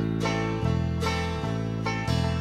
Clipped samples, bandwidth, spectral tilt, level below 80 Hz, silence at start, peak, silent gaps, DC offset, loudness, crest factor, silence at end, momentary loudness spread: under 0.1%; 13 kHz; -6 dB/octave; -38 dBFS; 0 s; -14 dBFS; none; under 0.1%; -28 LUFS; 12 dB; 0 s; 3 LU